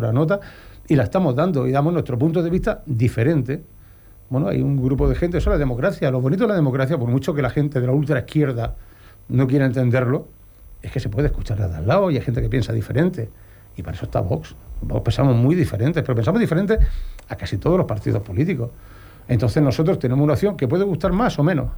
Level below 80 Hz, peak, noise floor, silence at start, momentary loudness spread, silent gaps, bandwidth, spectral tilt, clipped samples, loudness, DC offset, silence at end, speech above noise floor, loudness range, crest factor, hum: -32 dBFS; -6 dBFS; -45 dBFS; 0 s; 10 LU; none; over 20 kHz; -8.5 dB/octave; under 0.1%; -20 LUFS; under 0.1%; 0 s; 26 dB; 2 LU; 14 dB; none